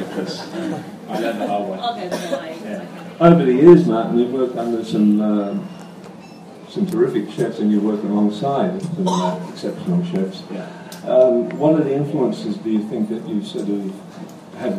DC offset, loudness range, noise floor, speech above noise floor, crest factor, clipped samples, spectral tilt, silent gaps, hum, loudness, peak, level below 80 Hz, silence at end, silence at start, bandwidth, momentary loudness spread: under 0.1%; 6 LU; -38 dBFS; 20 dB; 18 dB; under 0.1%; -7.5 dB/octave; none; none; -19 LUFS; 0 dBFS; -60 dBFS; 0 s; 0 s; 14 kHz; 18 LU